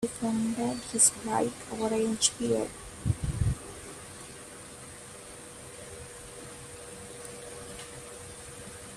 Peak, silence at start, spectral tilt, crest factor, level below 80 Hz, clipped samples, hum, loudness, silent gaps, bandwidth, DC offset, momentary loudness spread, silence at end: -8 dBFS; 0 s; -3.5 dB/octave; 24 dB; -48 dBFS; under 0.1%; none; -29 LUFS; none; 15 kHz; under 0.1%; 18 LU; 0 s